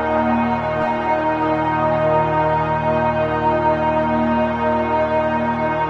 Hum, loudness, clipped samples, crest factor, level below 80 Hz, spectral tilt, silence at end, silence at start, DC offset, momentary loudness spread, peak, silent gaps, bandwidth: none; -18 LUFS; under 0.1%; 12 dB; -42 dBFS; -8.5 dB/octave; 0 s; 0 s; under 0.1%; 2 LU; -6 dBFS; none; 7.2 kHz